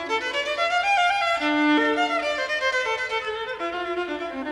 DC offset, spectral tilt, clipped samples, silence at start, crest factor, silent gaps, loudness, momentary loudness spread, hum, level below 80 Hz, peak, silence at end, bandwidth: under 0.1%; -2.5 dB/octave; under 0.1%; 0 s; 14 dB; none; -23 LUFS; 9 LU; none; -58 dBFS; -10 dBFS; 0 s; 12 kHz